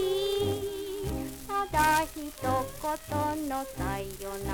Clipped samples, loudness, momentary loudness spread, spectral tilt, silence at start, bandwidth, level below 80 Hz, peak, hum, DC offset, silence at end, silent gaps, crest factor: under 0.1%; -31 LUFS; 10 LU; -4.5 dB/octave; 0 s; over 20 kHz; -46 dBFS; -12 dBFS; none; under 0.1%; 0 s; none; 20 dB